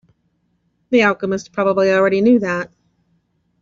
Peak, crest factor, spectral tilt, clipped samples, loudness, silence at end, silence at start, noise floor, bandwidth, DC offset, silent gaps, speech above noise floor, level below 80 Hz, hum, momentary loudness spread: -2 dBFS; 16 dB; -4.5 dB/octave; under 0.1%; -16 LUFS; 0.95 s; 0.9 s; -65 dBFS; 7.6 kHz; under 0.1%; none; 50 dB; -58 dBFS; none; 8 LU